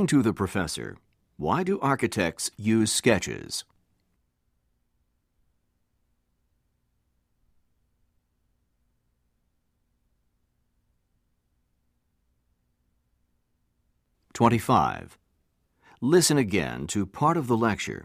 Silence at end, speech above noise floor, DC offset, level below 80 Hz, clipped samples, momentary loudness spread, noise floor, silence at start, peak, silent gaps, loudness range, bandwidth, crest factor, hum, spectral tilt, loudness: 0 s; 49 dB; under 0.1%; -60 dBFS; under 0.1%; 12 LU; -74 dBFS; 0 s; -6 dBFS; none; 7 LU; 15.5 kHz; 22 dB; none; -4.5 dB/octave; -25 LUFS